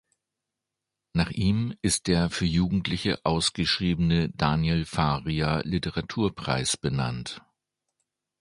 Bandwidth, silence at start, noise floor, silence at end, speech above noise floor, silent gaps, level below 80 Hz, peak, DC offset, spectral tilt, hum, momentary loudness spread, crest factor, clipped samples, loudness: 11.5 kHz; 1.15 s; -86 dBFS; 1 s; 60 dB; none; -42 dBFS; -6 dBFS; under 0.1%; -5 dB/octave; none; 5 LU; 20 dB; under 0.1%; -26 LUFS